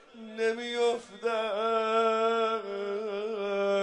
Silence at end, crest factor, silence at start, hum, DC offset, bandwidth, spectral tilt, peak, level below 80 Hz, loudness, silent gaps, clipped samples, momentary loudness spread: 0 s; 14 dB; 0.15 s; none; under 0.1%; 10.5 kHz; -4 dB/octave; -16 dBFS; -78 dBFS; -29 LUFS; none; under 0.1%; 7 LU